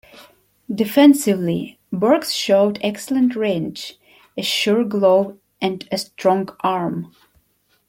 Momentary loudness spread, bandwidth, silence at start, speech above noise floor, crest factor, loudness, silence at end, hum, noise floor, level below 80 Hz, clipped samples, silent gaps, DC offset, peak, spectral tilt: 15 LU; 16.5 kHz; 0.15 s; 45 dB; 18 dB; -19 LUFS; 0.85 s; 50 Hz at -40 dBFS; -63 dBFS; -62 dBFS; under 0.1%; none; under 0.1%; -2 dBFS; -5 dB/octave